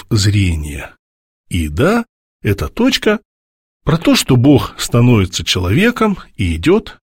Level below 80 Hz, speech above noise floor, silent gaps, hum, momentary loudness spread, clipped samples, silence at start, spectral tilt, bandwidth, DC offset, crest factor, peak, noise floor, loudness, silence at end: -32 dBFS; over 77 dB; 0.99-1.44 s, 2.09-2.40 s, 3.25-3.80 s; none; 11 LU; under 0.1%; 0.1 s; -5.5 dB/octave; 16.5 kHz; under 0.1%; 14 dB; 0 dBFS; under -90 dBFS; -14 LUFS; 0.2 s